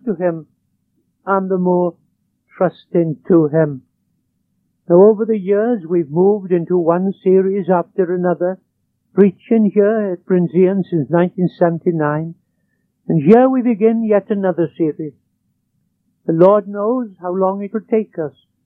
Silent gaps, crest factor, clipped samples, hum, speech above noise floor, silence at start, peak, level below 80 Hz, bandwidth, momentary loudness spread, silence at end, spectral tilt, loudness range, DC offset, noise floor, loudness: none; 16 dB; under 0.1%; none; 52 dB; 0.05 s; 0 dBFS; -68 dBFS; 4.2 kHz; 11 LU; 0.35 s; -12 dB/octave; 3 LU; under 0.1%; -67 dBFS; -16 LUFS